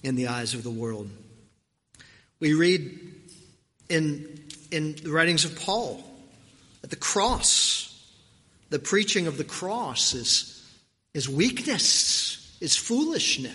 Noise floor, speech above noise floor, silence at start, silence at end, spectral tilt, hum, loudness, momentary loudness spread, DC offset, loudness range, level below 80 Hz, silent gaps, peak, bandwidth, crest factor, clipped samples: -67 dBFS; 41 dB; 0.05 s; 0 s; -2.5 dB/octave; none; -24 LUFS; 17 LU; under 0.1%; 5 LU; -50 dBFS; none; -6 dBFS; 11.5 kHz; 22 dB; under 0.1%